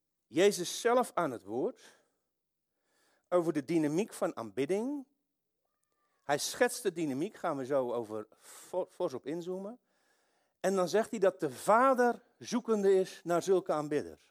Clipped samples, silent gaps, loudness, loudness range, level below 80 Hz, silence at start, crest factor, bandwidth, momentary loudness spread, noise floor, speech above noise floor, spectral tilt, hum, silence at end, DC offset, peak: under 0.1%; none; -32 LUFS; 7 LU; -82 dBFS; 0.3 s; 20 dB; 16 kHz; 11 LU; -86 dBFS; 54 dB; -4.5 dB/octave; none; 0.15 s; under 0.1%; -14 dBFS